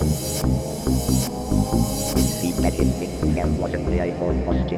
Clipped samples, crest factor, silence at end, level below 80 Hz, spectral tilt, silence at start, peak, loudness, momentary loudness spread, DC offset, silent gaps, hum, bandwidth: under 0.1%; 16 dB; 0 s; -28 dBFS; -5.5 dB/octave; 0 s; -4 dBFS; -23 LUFS; 3 LU; under 0.1%; none; none; 16.5 kHz